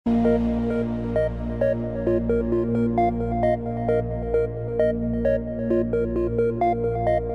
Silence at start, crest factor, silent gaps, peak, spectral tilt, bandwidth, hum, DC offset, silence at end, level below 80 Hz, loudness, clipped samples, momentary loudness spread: 0.05 s; 14 dB; none; -10 dBFS; -10 dB/octave; 5.2 kHz; 60 Hz at -50 dBFS; 0.3%; 0 s; -36 dBFS; -24 LUFS; under 0.1%; 4 LU